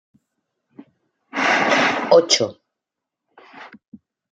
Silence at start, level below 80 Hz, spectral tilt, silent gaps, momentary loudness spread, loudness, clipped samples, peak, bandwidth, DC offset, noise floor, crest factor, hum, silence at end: 1.35 s; -74 dBFS; -2 dB/octave; 3.88-3.92 s; 11 LU; -17 LUFS; under 0.1%; -2 dBFS; 9.4 kHz; under 0.1%; -84 dBFS; 20 dB; none; 0.35 s